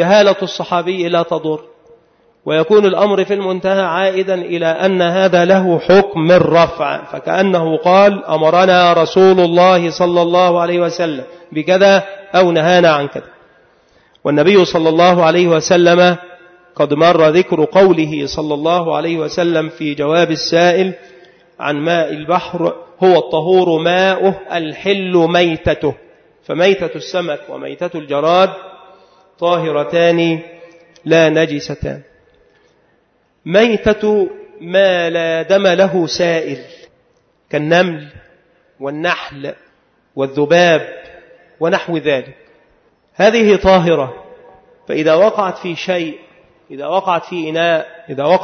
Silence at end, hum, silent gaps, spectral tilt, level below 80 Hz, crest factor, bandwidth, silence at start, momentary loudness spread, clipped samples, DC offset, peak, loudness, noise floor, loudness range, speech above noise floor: 0 s; none; none; -5.5 dB/octave; -46 dBFS; 14 dB; 6.6 kHz; 0 s; 13 LU; under 0.1%; under 0.1%; 0 dBFS; -13 LUFS; -58 dBFS; 6 LU; 45 dB